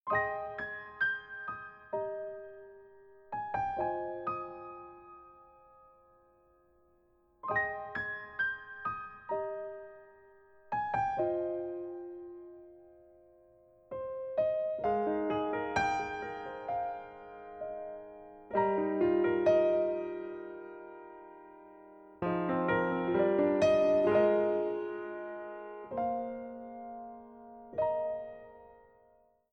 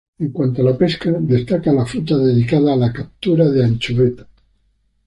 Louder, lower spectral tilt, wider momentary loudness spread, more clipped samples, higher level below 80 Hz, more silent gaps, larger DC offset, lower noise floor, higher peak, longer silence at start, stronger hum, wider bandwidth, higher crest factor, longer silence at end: second, -33 LUFS vs -16 LUFS; second, -6.5 dB/octave vs -8.5 dB/octave; first, 23 LU vs 6 LU; neither; second, -66 dBFS vs -46 dBFS; neither; neither; first, -68 dBFS vs -61 dBFS; second, -16 dBFS vs -2 dBFS; second, 0.05 s vs 0.2 s; neither; second, 8 kHz vs 11 kHz; about the same, 18 dB vs 14 dB; about the same, 0.75 s vs 0.85 s